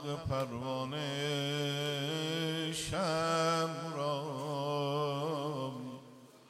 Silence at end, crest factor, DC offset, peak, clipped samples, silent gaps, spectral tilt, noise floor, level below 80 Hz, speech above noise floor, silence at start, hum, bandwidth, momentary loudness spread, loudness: 0.1 s; 16 dB; under 0.1%; -20 dBFS; under 0.1%; none; -4.5 dB/octave; -56 dBFS; -64 dBFS; 21 dB; 0 s; none; 15 kHz; 7 LU; -35 LUFS